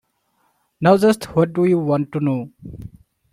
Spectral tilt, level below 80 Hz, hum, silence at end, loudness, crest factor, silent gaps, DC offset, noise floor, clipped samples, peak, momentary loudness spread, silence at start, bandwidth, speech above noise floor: -7.5 dB/octave; -52 dBFS; none; 0.45 s; -18 LUFS; 18 dB; none; under 0.1%; -66 dBFS; under 0.1%; -2 dBFS; 22 LU; 0.8 s; 16 kHz; 48 dB